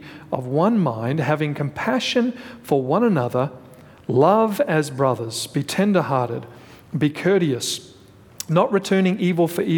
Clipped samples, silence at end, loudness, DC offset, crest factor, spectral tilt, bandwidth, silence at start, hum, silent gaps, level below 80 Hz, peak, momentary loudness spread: under 0.1%; 0 s; -21 LUFS; under 0.1%; 18 dB; -6 dB/octave; 19.5 kHz; 0 s; none; none; -62 dBFS; -4 dBFS; 10 LU